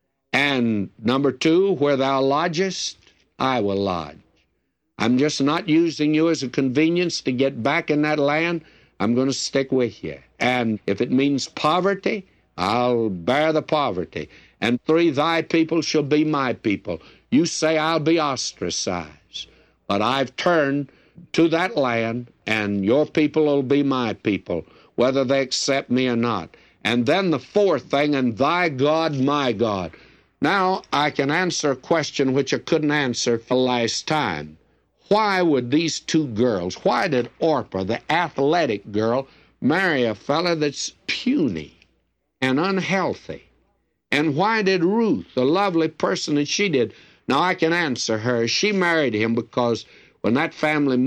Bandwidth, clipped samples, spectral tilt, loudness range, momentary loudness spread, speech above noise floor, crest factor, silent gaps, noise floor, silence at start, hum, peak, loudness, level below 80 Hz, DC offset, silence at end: 10.5 kHz; under 0.1%; -5 dB/octave; 2 LU; 8 LU; 52 dB; 14 dB; none; -72 dBFS; 0.35 s; none; -8 dBFS; -21 LUFS; -60 dBFS; under 0.1%; 0 s